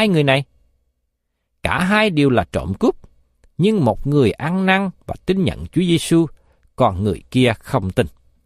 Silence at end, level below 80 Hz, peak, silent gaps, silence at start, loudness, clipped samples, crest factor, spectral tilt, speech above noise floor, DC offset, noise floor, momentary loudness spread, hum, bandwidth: 0.35 s; -40 dBFS; -2 dBFS; none; 0 s; -18 LUFS; under 0.1%; 18 dB; -6.5 dB/octave; 55 dB; under 0.1%; -72 dBFS; 10 LU; none; 15 kHz